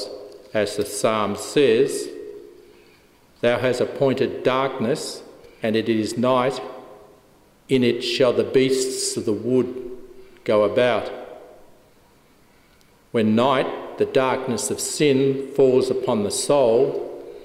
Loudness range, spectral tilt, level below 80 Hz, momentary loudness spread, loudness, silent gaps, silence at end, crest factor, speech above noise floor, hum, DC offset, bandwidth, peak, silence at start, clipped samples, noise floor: 4 LU; -4.5 dB/octave; -60 dBFS; 15 LU; -21 LUFS; none; 0 s; 16 dB; 35 dB; none; under 0.1%; 16 kHz; -6 dBFS; 0 s; under 0.1%; -55 dBFS